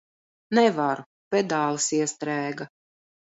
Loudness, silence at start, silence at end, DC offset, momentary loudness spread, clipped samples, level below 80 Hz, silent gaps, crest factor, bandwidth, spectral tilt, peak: -25 LUFS; 0.5 s; 0.65 s; under 0.1%; 12 LU; under 0.1%; -76 dBFS; 1.06-1.31 s; 20 dB; 8 kHz; -4 dB/octave; -6 dBFS